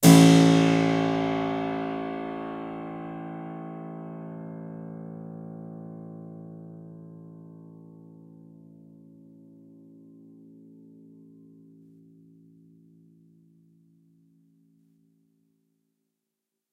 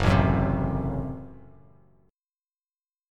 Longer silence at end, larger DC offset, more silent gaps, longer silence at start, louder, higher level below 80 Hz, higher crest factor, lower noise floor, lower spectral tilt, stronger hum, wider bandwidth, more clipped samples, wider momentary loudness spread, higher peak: first, 9.3 s vs 1.75 s; neither; neither; about the same, 0 s vs 0 s; about the same, -24 LUFS vs -26 LUFS; second, -66 dBFS vs -38 dBFS; about the same, 26 dB vs 22 dB; second, -85 dBFS vs under -90 dBFS; second, -6 dB/octave vs -8 dB/octave; neither; first, 16 kHz vs 10 kHz; neither; first, 27 LU vs 19 LU; about the same, -2 dBFS vs -4 dBFS